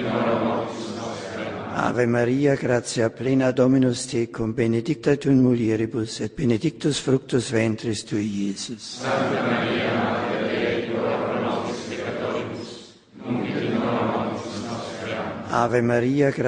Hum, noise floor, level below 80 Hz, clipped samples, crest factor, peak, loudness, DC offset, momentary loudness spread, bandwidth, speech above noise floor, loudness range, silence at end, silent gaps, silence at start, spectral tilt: none; -43 dBFS; -56 dBFS; under 0.1%; 18 dB; -6 dBFS; -24 LUFS; under 0.1%; 11 LU; 10.5 kHz; 21 dB; 6 LU; 0 s; none; 0 s; -6 dB/octave